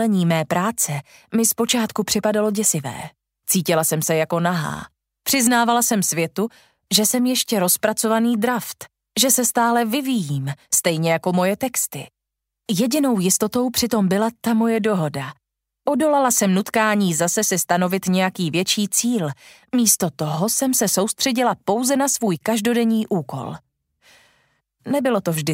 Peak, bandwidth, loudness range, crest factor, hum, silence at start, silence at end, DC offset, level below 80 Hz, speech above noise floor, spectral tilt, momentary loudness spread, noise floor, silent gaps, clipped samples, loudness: -2 dBFS; 16.5 kHz; 2 LU; 20 dB; none; 0 s; 0 s; under 0.1%; -60 dBFS; 63 dB; -3.5 dB/octave; 10 LU; -82 dBFS; none; under 0.1%; -19 LUFS